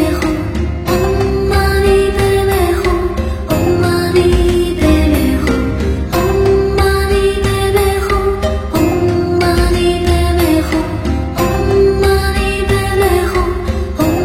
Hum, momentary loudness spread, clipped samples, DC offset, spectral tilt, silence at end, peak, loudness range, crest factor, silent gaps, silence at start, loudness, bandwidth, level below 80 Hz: none; 5 LU; under 0.1%; under 0.1%; -6 dB/octave; 0 s; 0 dBFS; 1 LU; 12 dB; none; 0 s; -13 LUFS; 16.5 kHz; -20 dBFS